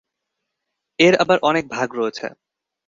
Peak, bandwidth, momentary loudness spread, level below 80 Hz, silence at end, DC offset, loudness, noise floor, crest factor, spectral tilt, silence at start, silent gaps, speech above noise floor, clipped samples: 0 dBFS; 7.6 kHz; 17 LU; -62 dBFS; 0.6 s; under 0.1%; -18 LUFS; -79 dBFS; 20 dB; -4.5 dB/octave; 1 s; none; 61 dB; under 0.1%